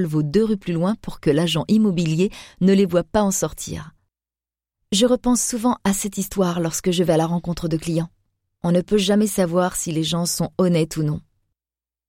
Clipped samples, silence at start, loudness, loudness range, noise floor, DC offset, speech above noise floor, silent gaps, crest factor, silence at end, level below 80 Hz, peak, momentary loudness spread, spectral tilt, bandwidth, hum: under 0.1%; 0 s; -20 LUFS; 2 LU; under -90 dBFS; under 0.1%; over 70 dB; none; 16 dB; 0.9 s; -46 dBFS; -6 dBFS; 7 LU; -5 dB/octave; 16.5 kHz; none